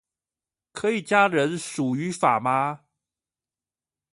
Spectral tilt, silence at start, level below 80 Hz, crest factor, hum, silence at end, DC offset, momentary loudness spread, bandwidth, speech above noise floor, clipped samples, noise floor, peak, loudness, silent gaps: -5 dB/octave; 0.75 s; -70 dBFS; 20 dB; none; 1.35 s; under 0.1%; 9 LU; 11.5 kHz; over 67 dB; under 0.1%; under -90 dBFS; -6 dBFS; -23 LUFS; none